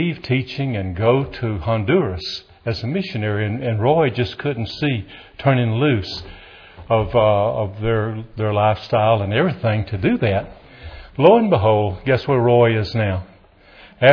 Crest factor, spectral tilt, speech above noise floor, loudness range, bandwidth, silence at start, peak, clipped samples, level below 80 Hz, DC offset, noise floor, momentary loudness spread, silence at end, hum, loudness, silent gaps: 18 dB; -8.5 dB/octave; 30 dB; 4 LU; 5.4 kHz; 0 s; 0 dBFS; under 0.1%; -44 dBFS; under 0.1%; -48 dBFS; 11 LU; 0 s; none; -19 LUFS; none